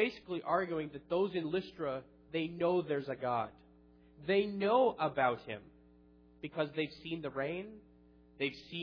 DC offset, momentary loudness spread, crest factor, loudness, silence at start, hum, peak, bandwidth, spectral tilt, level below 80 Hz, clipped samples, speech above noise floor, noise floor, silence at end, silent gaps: under 0.1%; 13 LU; 20 dB; -36 LUFS; 0 s; 60 Hz at -65 dBFS; -16 dBFS; 5.4 kHz; -4 dB/octave; -68 dBFS; under 0.1%; 27 dB; -63 dBFS; 0 s; none